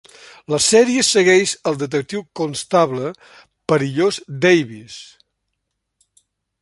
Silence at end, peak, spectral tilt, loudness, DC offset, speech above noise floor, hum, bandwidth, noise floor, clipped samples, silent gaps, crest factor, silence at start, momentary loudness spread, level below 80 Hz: 1.55 s; -2 dBFS; -3.5 dB/octave; -17 LUFS; under 0.1%; 59 dB; none; 11.5 kHz; -76 dBFS; under 0.1%; none; 18 dB; 0.5 s; 16 LU; -60 dBFS